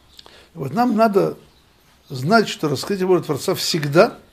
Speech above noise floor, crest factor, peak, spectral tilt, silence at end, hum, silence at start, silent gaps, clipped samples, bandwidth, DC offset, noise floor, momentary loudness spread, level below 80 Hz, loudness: 36 dB; 18 dB; 0 dBFS; -5 dB/octave; 0.15 s; none; 0.55 s; none; under 0.1%; 15.5 kHz; under 0.1%; -54 dBFS; 11 LU; -58 dBFS; -19 LUFS